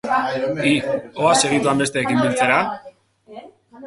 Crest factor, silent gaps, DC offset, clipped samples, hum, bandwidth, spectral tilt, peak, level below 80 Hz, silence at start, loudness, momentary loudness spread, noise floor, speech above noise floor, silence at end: 20 dB; none; under 0.1%; under 0.1%; none; 11.5 kHz; -4 dB/octave; 0 dBFS; -58 dBFS; 0.05 s; -18 LUFS; 7 LU; -45 dBFS; 26 dB; 0 s